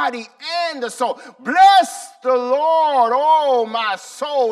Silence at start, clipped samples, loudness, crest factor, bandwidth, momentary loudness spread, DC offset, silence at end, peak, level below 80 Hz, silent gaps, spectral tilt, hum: 0 s; under 0.1%; -17 LUFS; 14 dB; 13.5 kHz; 14 LU; under 0.1%; 0 s; -4 dBFS; -66 dBFS; none; -1.5 dB/octave; none